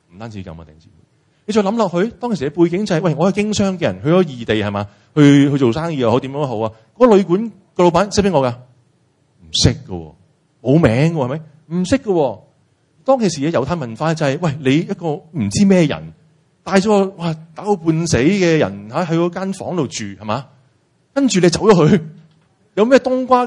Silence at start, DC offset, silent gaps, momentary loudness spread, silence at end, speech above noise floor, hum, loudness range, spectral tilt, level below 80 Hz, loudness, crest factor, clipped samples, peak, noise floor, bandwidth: 0.15 s; under 0.1%; none; 13 LU; 0 s; 43 dB; none; 4 LU; -6 dB/octave; -44 dBFS; -16 LUFS; 16 dB; under 0.1%; 0 dBFS; -58 dBFS; 11 kHz